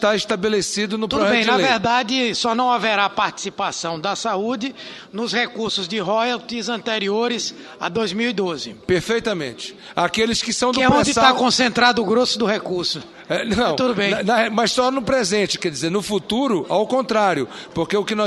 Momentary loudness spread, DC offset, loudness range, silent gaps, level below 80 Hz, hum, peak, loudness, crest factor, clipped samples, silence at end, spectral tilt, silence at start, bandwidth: 9 LU; under 0.1%; 5 LU; none; -50 dBFS; none; 0 dBFS; -19 LUFS; 20 dB; under 0.1%; 0 s; -3.5 dB/octave; 0 s; 12.5 kHz